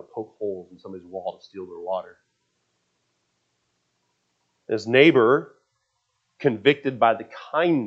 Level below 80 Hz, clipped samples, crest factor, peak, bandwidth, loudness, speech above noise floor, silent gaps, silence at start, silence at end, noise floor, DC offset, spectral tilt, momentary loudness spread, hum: -78 dBFS; under 0.1%; 22 dB; -2 dBFS; 7.6 kHz; -21 LUFS; 52 dB; none; 0.15 s; 0 s; -74 dBFS; under 0.1%; -6.5 dB/octave; 21 LU; none